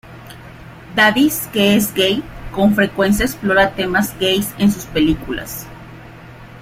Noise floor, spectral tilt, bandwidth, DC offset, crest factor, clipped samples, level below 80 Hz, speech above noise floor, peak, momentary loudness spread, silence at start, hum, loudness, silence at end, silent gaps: -37 dBFS; -4.5 dB/octave; 16 kHz; under 0.1%; 16 dB; under 0.1%; -38 dBFS; 21 dB; 0 dBFS; 22 LU; 0.05 s; none; -16 LUFS; 0 s; none